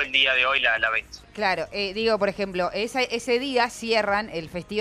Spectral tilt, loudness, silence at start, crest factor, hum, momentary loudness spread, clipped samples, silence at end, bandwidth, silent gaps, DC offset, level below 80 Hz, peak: -3 dB/octave; -23 LUFS; 0 s; 18 dB; 50 Hz at -55 dBFS; 9 LU; under 0.1%; 0 s; 14.5 kHz; none; under 0.1%; -54 dBFS; -6 dBFS